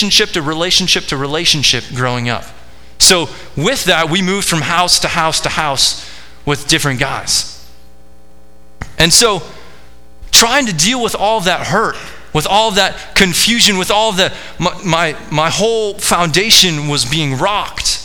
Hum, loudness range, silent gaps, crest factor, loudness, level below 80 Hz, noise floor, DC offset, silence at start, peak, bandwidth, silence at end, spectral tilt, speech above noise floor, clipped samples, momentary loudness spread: none; 3 LU; none; 14 dB; -12 LUFS; -34 dBFS; -45 dBFS; 3%; 0 s; 0 dBFS; over 20 kHz; 0 s; -2.5 dB/octave; 32 dB; under 0.1%; 11 LU